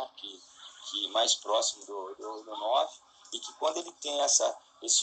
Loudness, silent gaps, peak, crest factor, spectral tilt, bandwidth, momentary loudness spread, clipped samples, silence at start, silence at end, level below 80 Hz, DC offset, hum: -30 LUFS; none; -10 dBFS; 22 dB; 2 dB/octave; 9.4 kHz; 18 LU; under 0.1%; 0 s; 0 s; -86 dBFS; under 0.1%; none